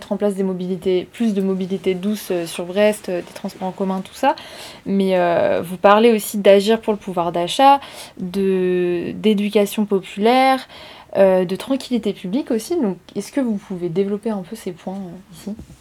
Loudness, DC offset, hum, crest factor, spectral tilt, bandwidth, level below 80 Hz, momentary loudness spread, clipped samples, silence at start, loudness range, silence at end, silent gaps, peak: -19 LUFS; under 0.1%; none; 18 dB; -5.5 dB/octave; 18.5 kHz; -56 dBFS; 16 LU; under 0.1%; 0 s; 6 LU; 0.05 s; none; 0 dBFS